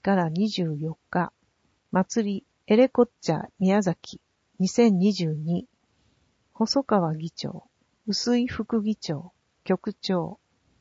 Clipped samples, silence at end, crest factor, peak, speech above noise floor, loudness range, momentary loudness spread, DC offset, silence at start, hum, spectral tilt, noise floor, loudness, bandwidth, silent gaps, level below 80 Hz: under 0.1%; 0.45 s; 18 dB; -6 dBFS; 45 dB; 5 LU; 14 LU; under 0.1%; 0.05 s; none; -6 dB/octave; -69 dBFS; -26 LUFS; 8 kHz; none; -62 dBFS